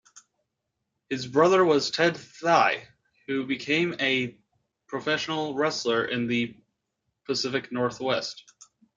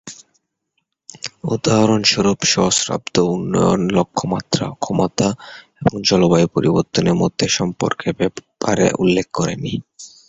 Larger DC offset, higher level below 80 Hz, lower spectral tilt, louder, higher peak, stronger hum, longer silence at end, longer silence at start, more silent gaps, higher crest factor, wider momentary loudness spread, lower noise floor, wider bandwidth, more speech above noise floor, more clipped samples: neither; second, -70 dBFS vs -46 dBFS; about the same, -4.5 dB/octave vs -4.5 dB/octave; second, -26 LUFS vs -17 LUFS; second, -6 dBFS vs -2 dBFS; neither; first, 0.55 s vs 0.2 s; about the same, 0.15 s vs 0.05 s; neither; about the same, 20 dB vs 16 dB; about the same, 13 LU vs 11 LU; first, -82 dBFS vs -72 dBFS; about the same, 9 kHz vs 8.2 kHz; about the same, 56 dB vs 55 dB; neither